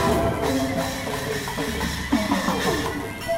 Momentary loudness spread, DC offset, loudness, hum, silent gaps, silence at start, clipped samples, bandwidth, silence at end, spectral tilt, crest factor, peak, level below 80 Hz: 5 LU; under 0.1%; -24 LUFS; none; none; 0 s; under 0.1%; 16 kHz; 0 s; -4.5 dB/octave; 16 dB; -8 dBFS; -38 dBFS